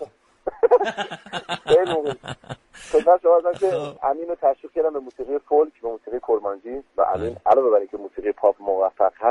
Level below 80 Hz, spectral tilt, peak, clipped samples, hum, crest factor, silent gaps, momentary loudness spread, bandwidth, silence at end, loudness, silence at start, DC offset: -56 dBFS; -5.5 dB/octave; -4 dBFS; under 0.1%; none; 18 dB; none; 15 LU; 11 kHz; 0 s; -21 LUFS; 0 s; under 0.1%